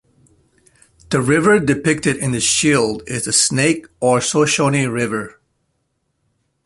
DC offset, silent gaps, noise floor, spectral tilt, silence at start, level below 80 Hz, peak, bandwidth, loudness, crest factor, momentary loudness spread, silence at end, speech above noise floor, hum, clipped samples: under 0.1%; none; -69 dBFS; -4 dB/octave; 1.1 s; -50 dBFS; -2 dBFS; 11.5 kHz; -16 LUFS; 16 dB; 8 LU; 1.35 s; 53 dB; none; under 0.1%